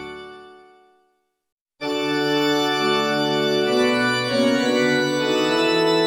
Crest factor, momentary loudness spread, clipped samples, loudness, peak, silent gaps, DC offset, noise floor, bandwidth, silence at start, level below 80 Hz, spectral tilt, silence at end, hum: 14 dB; 8 LU; under 0.1%; -19 LUFS; -6 dBFS; 1.52-1.66 s; under 0.1%; -68 dBFS; 16.5 kHz; 0 s; -60 dBFS; -4 dB/octave; 0 s; none